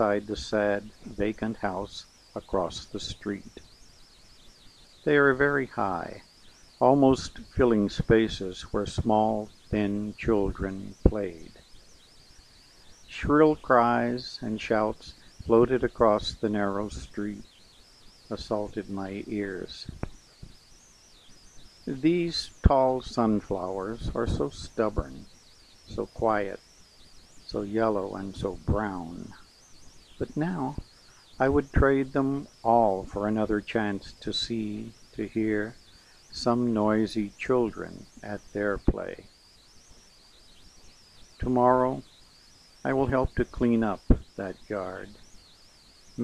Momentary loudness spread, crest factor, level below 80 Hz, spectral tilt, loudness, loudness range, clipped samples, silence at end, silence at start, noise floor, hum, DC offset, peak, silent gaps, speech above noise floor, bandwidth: 17 LU; 22 dB; -40 dBFS; -6.5 dB/octave; -27 LUFS; 9 LU; under 0.1%; 0 s; 0 s; -55 dBFS; none; under 0.1%; -6 dBFS; none; 29 dB; 12 kHz